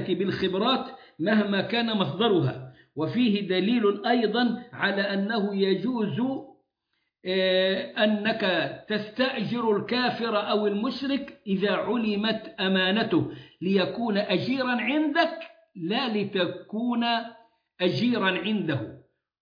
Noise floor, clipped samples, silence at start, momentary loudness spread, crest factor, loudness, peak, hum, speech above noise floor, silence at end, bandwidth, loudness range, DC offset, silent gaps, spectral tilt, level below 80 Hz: -78 dBFS; under 0.1%; 0 s; 8 LU; 16 dB; -26 LUFS; -10 dBFS; none; 52 dB; 0.45 s; 5.2 kHz; 2 LU; under 0.1%; none; -7.5 dB/octave; -68 dBFS